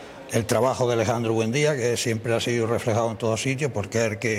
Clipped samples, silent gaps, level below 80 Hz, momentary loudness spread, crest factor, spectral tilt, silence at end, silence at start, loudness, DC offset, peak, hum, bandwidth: under 0.1%; none; -58 dBFS; 3 LU; 14 dB; -5 dB/octave; 0 s; 0 s; -24 LUFS; under 0.1%; -10 dBFS; none; 16 kHz